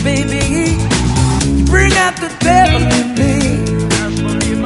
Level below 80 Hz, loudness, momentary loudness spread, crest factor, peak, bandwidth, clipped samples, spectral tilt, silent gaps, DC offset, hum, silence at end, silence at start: -20 dBFS; -13 LUFS; 6 LU; 12 dB; 0 dBFS; 11.5 kHz; under 0.1%; -5 dB/octave; none; under 0.1%; none; 0 s; 0 s